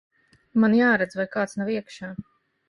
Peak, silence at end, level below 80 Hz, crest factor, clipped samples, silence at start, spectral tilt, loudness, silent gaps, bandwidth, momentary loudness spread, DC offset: -8 dBFS; 0.45 s; -64 dBFS; 16 dB; under 0.1%; 0.55 s; -6.5 dB/octave; -23 LUFS; none; 11 kHz; 18 LU; under 0.1%